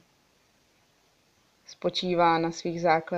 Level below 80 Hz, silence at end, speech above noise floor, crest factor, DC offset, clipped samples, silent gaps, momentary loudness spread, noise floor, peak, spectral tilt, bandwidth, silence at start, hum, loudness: -64 dBFS; 0 s; 40 dB; 20 dB; under 0.1%; under 0.1%; none; 8 LU; -66 dBFS; -8 dBFS; -5 dB/octave; 8.2 kHz; 1.7 s; none; -26 LUFS